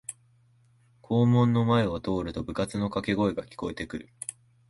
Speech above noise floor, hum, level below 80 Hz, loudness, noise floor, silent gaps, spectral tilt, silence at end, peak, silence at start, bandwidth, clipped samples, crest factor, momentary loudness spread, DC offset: 36 dB; none; -52 dBFS; -27 LUFS; -62 dBFS; none; -6.5 dB/octave; 0.4 s; -12 dBFS; 0.1 s; 11.5 kHz; under 0.1%; 16 dB; 16 LU; under 0.1%